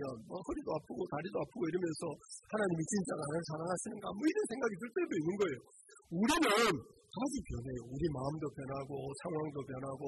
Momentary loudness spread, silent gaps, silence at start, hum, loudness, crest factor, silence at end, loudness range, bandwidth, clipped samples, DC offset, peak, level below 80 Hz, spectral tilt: 11 LU; none; 0 s; none; -37 LUFS; 18 dB; 0 s; 4 LU; 12 kHz; under 0.1%; under 0.1%; -18 dBFS; -62 dBFS; -5 dB/octave